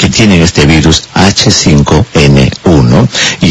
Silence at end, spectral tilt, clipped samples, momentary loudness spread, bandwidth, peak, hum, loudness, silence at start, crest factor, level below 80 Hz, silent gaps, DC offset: 0 s; -4.5 dB/octave; 4%; 3 LU; 11 kHz; 0 dBFS; none; -6 LUFS; 0 s; 6 dB; -20 dBFS; none; 0.2%